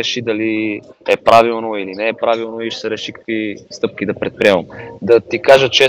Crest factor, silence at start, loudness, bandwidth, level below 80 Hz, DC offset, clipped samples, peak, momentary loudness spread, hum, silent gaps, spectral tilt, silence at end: 16 dB; 0 s; -16 LUFS; 15 kHz; -54 dBFS; under 0.1%; 0.7%; 0 dBFS; 12 LU; none; none; -4 dB/octave; 0 s